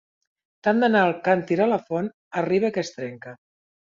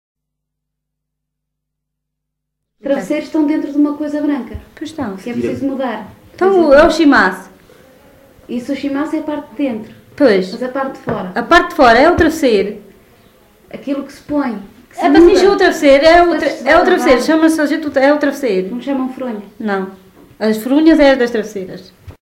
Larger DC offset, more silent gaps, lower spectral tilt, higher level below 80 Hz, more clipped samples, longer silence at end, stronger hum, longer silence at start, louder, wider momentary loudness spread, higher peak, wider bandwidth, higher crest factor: neither; first, 2.14-2.31 s vs none; first, -6.5 dB/octave vs -5 dB/octave; second, -68 dBFS vs -40 dBFS; neither; first, 0.55 s vs 0.15 s; neither; second, 0.65 s vs 2.85 s; second, -23 LUFS vs -13 LUFS; about the same, 15 LU vs 16 LU; second, -6 dBFS vs 0 dBFS; second, 7.6 kHz vs 16 kHz; about the same, 18 dB vs 14 dB